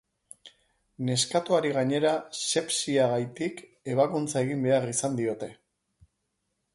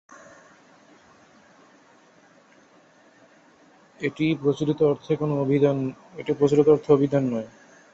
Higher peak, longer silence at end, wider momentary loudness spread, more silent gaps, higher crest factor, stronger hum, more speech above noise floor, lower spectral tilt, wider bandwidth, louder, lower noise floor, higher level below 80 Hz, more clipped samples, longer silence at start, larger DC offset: second, -10 dBFS vs -6 dBFS; first, 1.2 s vs 0.45 s; second, 9 LU vs 13 LU; neither; about the same, 18 dB vs 20 dB; neither; first, 52 dB vs 34 dB; second, -4 dB/octave vs -8 dB/octave; first, 11.5 kHz vs 7.8 kHz; second, -27 LUFS vs -23 LUFS; first, -79 dBFS vs -56 dBFS; second, -70 dBFS vs -62 dBFS; neither; second, 0.45 s vs 4 s; neither